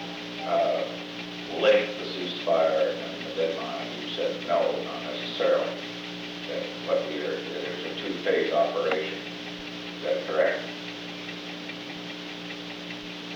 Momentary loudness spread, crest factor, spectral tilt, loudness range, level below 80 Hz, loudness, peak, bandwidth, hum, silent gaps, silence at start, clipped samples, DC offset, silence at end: 11 LU; 20 dB; -4.5 dB/octave; 5 LU; -68 dBFS; -29 LUFS; -10 dBFS; 19.5 kHz; 60 Hz at -70 dBFS; none; 0 s; under 0.1%; under 0.1%; 0 s